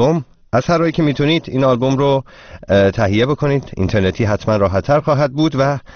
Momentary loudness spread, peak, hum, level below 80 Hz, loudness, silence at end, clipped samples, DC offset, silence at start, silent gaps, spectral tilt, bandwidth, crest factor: 4 LU; 0 dBFS; none; -40 dBFS; -16 LUFS; 0 s; under 0.1%; 0.3%; 0 s; none; -6 dB/octave; 6.6 kHz; 14 dB